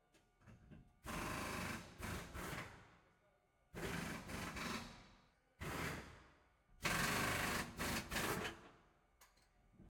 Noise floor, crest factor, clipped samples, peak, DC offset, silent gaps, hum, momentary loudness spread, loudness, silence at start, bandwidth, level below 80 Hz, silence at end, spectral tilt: -77 dBFS; 24 dB; under 0.1%; -24 dBFS; under 0.1%; none; none; 21 LU; -44 LUFS; 0.4 s; 17.5 kHz; -62 dBFS; 0 s; -3.5 dB/octave